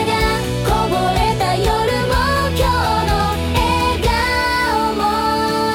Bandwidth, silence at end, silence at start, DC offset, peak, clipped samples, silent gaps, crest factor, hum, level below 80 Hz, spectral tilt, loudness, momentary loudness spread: 18 kHz; 0 s; 0 s; under 0.1%; -4 dBFS; under 0.1%; none; 12 dB; none; -26 dBFS; -5 dB/octave; -17 LUFS; 2 LU